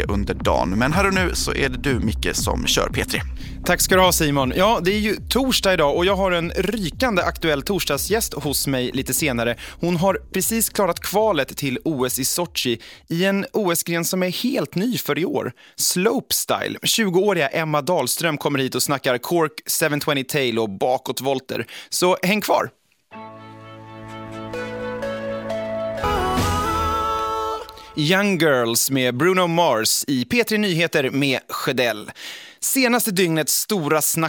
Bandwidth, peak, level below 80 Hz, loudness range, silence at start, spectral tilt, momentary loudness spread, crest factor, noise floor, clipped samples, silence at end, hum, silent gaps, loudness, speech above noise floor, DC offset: 17.5 kHz; -2 dBFS; -38 dBFS; 5 LU; 0 s; -3.5 dB/octave; 10 LU; 18 dB; -41 dBFS; under 0.1%; 0 s; none; none; -20 LUFS; 20 dB; under 0.1%